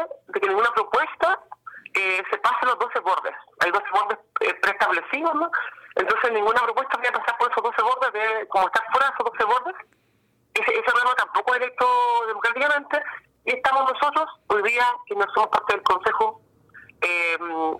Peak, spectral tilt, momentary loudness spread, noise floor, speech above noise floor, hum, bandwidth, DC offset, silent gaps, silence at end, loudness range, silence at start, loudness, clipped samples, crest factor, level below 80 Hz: -10 dBFS; -2.5 dB/octave; 6 LU; -65 dBFS; 42 dB; none; 16 kHz; under 0.1%; none; 0 s; 1 LU; 0 s; -22 LUFS; under 0.1%; 12 dB; -64 dBFS